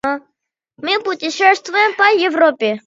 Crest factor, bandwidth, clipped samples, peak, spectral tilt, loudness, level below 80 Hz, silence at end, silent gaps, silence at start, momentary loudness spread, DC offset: 16 dB; 7.8 kHz; under 0.1%; 0 dBFS; -2.5 dB/octave; -14 LUFS; -64 dBFS; 0.1 s; none; 0.05 s; 10 LU; under 0.1%